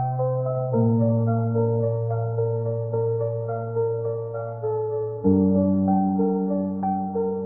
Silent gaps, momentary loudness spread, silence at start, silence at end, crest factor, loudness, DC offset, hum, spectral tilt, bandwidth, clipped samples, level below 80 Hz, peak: none; 7 LU; 0 s; 0 s; 14 dB; -24 LUFS; 0.1%; none; -16.5 dB/octave; 1.9 kHz; under 0.1%; -64 dBFS; -8 dBFS